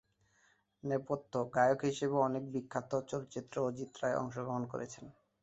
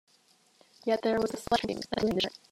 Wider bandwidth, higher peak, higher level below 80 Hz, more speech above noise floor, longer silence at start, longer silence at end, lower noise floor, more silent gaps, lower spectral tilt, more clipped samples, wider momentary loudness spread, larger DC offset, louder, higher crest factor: second, 8 kHz vs 15.5 kHz; second, -16 dBFS vs -10 dBFS; second, -72 dBFS vs -60 dBFS; about the same, 37 dB vs 36 dB; about the same, 0.85 s vs 0.85 s; about the same, 0.3 s vs 0.2 s; first, -72 dBFS vs -65 dBFS; neither; first, -6 dB/octave vs -4.5 dB/octave; neither; first, 11 LU vs 4 LU; neither; second, -36 LUFS vs -30 LUFS; about the same, 20 dB vs 22 dB